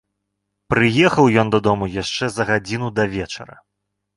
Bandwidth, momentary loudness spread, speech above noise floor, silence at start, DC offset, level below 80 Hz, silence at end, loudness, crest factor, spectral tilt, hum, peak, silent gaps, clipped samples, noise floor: 11.5 kHz; 10 LU; 59 dB; 0.7 s; under 0.1%; -46 dBFS; 0.75 s; -18 LUFS; 18 dB; -5.5 dB/octave; 50 Hz at -45 dBFS; -2 dBFS; none; under 0.1%; -77 dBFS